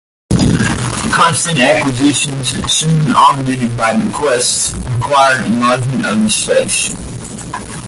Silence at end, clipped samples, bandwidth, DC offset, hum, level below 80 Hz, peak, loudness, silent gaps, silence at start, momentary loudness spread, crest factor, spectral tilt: 0 s; under 0.1%; 12 kHz; under 0.1%; none; -34 dBFS; 0 dBFS; -12 LUFS; none; 0.3 s; 8 LU; 14 dB; -4 dB/octave